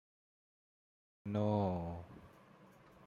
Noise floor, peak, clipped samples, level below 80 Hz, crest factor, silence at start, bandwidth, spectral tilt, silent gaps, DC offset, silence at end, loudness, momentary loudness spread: -62 dBFS; -22 dBFS; under 0.1%; -70 dBFS; 20 dB; 1.25 s; 7 kHz; -9.5 dB/octave; none; under 0.1%; 0.4 s; -38 LUFS; 21 LU